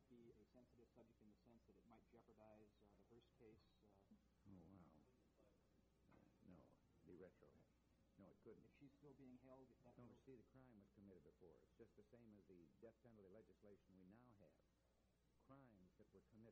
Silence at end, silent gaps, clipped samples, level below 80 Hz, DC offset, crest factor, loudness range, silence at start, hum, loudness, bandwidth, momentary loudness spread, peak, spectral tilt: 0 s; none; under 0.1%; -84 dBFS; under 0.1%; 18 dB; 1 LU; 0 s; none; -69 LUFS; 4.8 kHz; 3 LU; -54 dBFS; -7 dB/octave